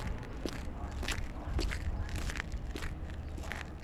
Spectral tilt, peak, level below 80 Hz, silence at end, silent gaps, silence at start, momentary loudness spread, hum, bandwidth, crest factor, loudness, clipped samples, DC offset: -5 dB/octave; -16 dBFS; -40 dBFS; 0 s; none; 0 s; 5 LU; none; 15 kHz; 22 dB; -40 LUFS; under 0.1%; under 0.1%